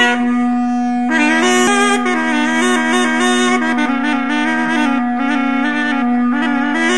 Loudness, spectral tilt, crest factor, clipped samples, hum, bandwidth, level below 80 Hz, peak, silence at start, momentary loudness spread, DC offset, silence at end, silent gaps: -14 LUFS; -2.5 dB/octave; 14 dB; under 0.1%; none; 11.5 kHz; -54 dBFS; 0 dBFS; 0 s; 4 LU; 2%; 0 s; none